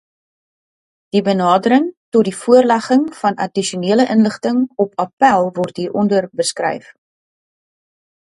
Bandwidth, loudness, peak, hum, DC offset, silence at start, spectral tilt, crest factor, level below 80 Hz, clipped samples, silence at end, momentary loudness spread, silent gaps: 11.5 kHz; -16 LUFS; 0 dBFS; none; under 0.1%; 1.15 s; -5 dB/octave; 16 dB; -62 dBFS; under 0.1%; 1.6 s; 8 LU; 1.97-2.12 s, 5.13-5.17 s